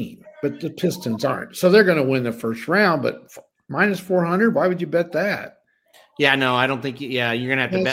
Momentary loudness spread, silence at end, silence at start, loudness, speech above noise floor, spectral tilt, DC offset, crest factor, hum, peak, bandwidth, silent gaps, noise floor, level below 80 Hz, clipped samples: 11 LU; 0 s; 0 s; -20 LUFS; 35 dB; -5.5 dB/octave; under 0.1%; 20 dB; none; 0 dBFS; 16.5 kHz; none; -55 dBFS; -64 dBFS; under 0.1%